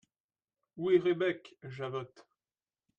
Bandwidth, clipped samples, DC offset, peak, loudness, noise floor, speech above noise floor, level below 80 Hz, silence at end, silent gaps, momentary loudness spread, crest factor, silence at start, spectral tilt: 6.8 kHz; under 0.1%; under 0.1%; -16 dBFS; -33 LUFS; under -90 dBFS; over 58 dB; -80 dBFS; 0.8 s; none; 17 LU; 20 dB; 0.75 s; -7.5 dB/octave